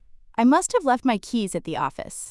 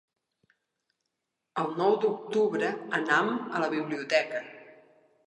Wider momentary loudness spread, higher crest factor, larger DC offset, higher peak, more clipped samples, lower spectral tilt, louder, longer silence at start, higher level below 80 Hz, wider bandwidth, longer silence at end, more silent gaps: about the same, 10 LU vs 9 LU; second, 14 dB vs 20 dB; neither; about the same, -8 dBFS vs -10 dBFS; neither; about the same, -4 dB/octave vs -5 dB/octave; first, -23 LUFS vs -28 LUFS; second, 0.15 s vs 1.55 s; first, -54 dBFS vs -86 dBFS; first, 12 kHz vs 9.6 kHz; second, 0 s vs 0.55 s; neither